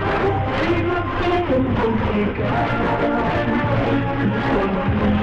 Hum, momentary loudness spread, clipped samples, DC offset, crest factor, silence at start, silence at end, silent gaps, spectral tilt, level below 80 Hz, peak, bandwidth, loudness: none; 2 LU; under 0.1%; under 0.1%; 10 dB; 0 s; 0 s; none; -8.5 dB/octave; -32 dBFS; -8 dBFS; 7.8 kHz; -20 LUFS